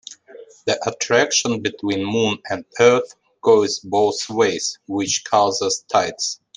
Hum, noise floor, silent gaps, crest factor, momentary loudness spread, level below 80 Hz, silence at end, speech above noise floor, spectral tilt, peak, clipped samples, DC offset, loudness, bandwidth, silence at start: none; -43 dBFS; none; 18 dB; 9 LU; -66 dBFS; 0.2 s; 24 dB; -3 dB/octave; -2 dBFS; under 0.1%; under 0.1%; -19 LUFS; 10.5 kHz; 0.1 s